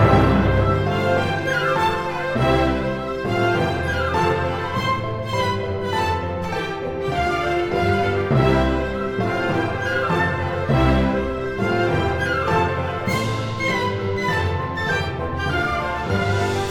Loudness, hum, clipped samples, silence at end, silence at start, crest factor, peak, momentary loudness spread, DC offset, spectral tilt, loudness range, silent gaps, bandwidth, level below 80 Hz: -21 LUFS; none; under 0.1%; 0 s; 0 s; 18 dB; -2 dBFS; 6 LU; under 0.1%; -6.5 dB/octave; 2 LU; none; 16.5 kHz; -34 dBFS